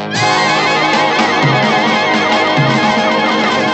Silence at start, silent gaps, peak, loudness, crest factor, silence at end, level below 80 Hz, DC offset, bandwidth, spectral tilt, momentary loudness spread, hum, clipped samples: 0 s; none; 0 dBFS; -11 LUFS; 12 dB; 0 s; -56 dBFS; under 0.1%; 8.6 kHz; -4.5 dB/octave; 1 LU; none; under 0.1%